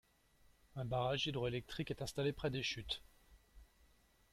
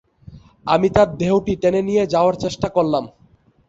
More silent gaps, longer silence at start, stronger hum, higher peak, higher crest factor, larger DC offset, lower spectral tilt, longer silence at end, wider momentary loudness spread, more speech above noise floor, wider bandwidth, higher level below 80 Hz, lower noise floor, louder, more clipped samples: neither; first, 0.75 s vs 0.3 s; neither; second, -26 dBFS vs -2 dBFS; about the same, 18 dB vs 18 dB; neither; second, -5 dB/octave vs -6.5 dB/octave; about the same, 0.7 s vs 0.6 s; about the same, 7 LU vs 7 LU; second, 30 dB vs 37 dB; first, 15 kHz vs 8 kHz; second, -62 dBFS vs -44 dBFS; first, -71 dBFS vs -54 dBFS; second, -41 LUFS vs -18 LUFS; neither